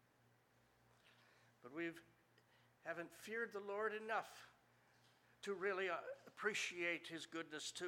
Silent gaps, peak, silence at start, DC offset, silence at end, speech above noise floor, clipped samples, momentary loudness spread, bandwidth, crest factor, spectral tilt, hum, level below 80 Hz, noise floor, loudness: none; -28 dBFS; 1.05 s; under 0.1%; 0 s; 29 dB; under 0.1%; 14 LU; 17 kHz; 22 dB; -2.5 dB/octave; 60 Hz at -80 dBFS; under -90 dBFS; -76 dBFS; -46 LUFS